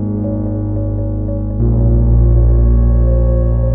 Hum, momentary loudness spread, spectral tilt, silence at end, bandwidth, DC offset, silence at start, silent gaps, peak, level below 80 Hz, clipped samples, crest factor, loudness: none; 7 LU; -16 dB/octave; 0 s; 1.8 kHz; under 0.1%; 0 s; none; -2 dBFS; -14 dBFS; under 0.1%; 10 dB; -14 LUFS